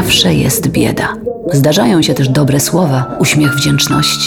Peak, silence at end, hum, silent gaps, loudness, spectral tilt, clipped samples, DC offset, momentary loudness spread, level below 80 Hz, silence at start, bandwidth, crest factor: 0 dBFS; 0 s; none; none; -11 LUFS; -4.5 dB/octave; under 0.1%; under 0.1%; 5 LU; -36 dBFS; 0 s; 19 kHz; 10 dB